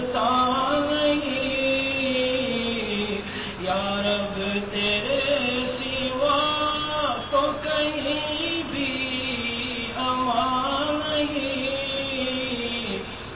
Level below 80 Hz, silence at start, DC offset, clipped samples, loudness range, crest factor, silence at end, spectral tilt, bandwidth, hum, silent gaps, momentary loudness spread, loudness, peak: -48 dBFS; 0 s; 0.2%; under 0.1%; 2 LU; 16 dB; 0 s; -8.5 dB/octave; 4 kHz; none; none; 5 LU; -24 LUFS; -10 dBFS